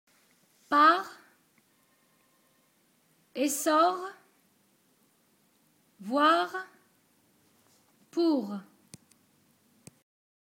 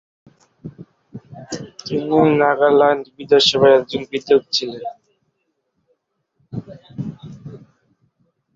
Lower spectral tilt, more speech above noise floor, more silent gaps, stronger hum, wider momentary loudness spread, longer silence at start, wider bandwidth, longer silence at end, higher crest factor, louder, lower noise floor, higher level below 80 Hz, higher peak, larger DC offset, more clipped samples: second, -3 dB/octave vs -5 dB/octave; second, 43 dB vs 55 dB; neither; neither; second, 21 LU vs 25 LU; about the same, 0.7 s vs 0.65 s; first, 16.5 kHz vs 7.8 kHz; first, 1.8 s vs 1 s; first, 24 dB vs 18 dB; second, -27 LUFS vs -16 LUFS; about the same, -68 dBFS vs -71 dBFS; second, -86 dBFS vs -58 dBFS; second, -8 dBFS vs -2 dBFS; neither; neither